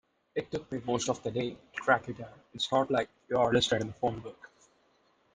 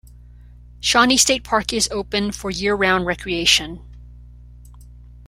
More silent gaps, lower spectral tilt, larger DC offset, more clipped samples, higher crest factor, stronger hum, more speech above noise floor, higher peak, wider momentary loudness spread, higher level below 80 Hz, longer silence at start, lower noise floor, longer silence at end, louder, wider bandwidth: neither; first, -4.5 dB/octave vs -2 dB/octave; neither; neither; about the same, 22 dB vs 20 dB; second, none vs 60 Hz at -40 dBFS; first, 38 dB vs 24 dB; second, -10 dBFS vs -2 dBFS; first, 15 LU vs 10 LU; second, -62 dBFS vs -40 dBFS; second, 0.35 s vs 0.5 s; first, -69 dBFS vs -43 dBFS; first, 0.9 s vs 0 s; second, -31 LUFS vs -18 LUFS; second, 10 kHz vs 16 kHz